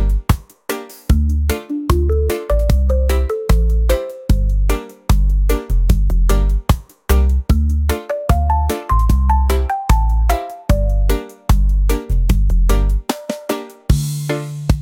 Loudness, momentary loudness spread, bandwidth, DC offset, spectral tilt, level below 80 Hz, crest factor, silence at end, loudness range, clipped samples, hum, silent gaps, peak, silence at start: -18 LUFS; 6 LU; 17 kHz; under 0.1%; -6.5 dB/octave; -16 dBFS; 14 dB; 0 s; 1 LU; under 0.1%; none; none; 0 dBFS; 0 s